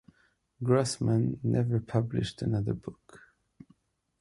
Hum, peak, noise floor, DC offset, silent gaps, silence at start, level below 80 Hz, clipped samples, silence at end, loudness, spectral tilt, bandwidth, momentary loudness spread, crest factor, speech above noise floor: none; -12 dBFS; -69 dBFS; under 0.1%; none; 0.6 s; -56 dBFS; under 0.1%; 1.05 s; -30 LUFS; -7 dB/octave; 11.5 kHz; 9 LU; 18 dB; 40 dB